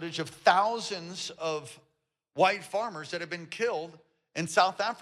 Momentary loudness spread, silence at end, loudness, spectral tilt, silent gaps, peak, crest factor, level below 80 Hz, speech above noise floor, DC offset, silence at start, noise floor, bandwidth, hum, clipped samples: 13 LU; 0 s; -29 LUFS; -3.5 dB/octave; none; -10 dBFS; 22 dB; -78 dBFS; 44 dB; under 0.1%; 0 s; -74 dBFS; 14 kHz; none; under 0.1%